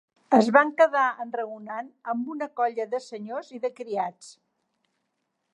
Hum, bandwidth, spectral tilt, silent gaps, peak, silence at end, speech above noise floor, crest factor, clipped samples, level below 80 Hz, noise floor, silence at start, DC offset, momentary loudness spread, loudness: none; 11 kHz; -5.5 dB/octave; none; -4 dBFS; 1.2 s; 53 dB; 22 dB; under 0.1%; -86 dBFS; -78 dBFS; 0.3 s; under 0.1%; 16 LU; -25 LUFS